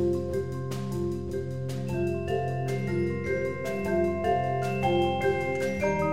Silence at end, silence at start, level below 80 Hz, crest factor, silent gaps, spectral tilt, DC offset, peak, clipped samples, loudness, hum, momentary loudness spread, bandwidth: 0 s; 0 s; -50 dBFS; 14 dB; none; -7 dB/octave; 0.6%; -14 dBFS; under 0.1%; -29 LUFS; none; 7 LU; 16 kHz